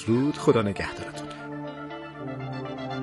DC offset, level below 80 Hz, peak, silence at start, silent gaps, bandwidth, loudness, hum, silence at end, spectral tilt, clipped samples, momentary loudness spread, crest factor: under 0.1%; -58 dBFS; -8 dBFS; 0 s; none; 11.5 kHz; -29 LUFS; none; 0 s; -6.5 dB/octave; under 0.1%; 14 LU; 20 dB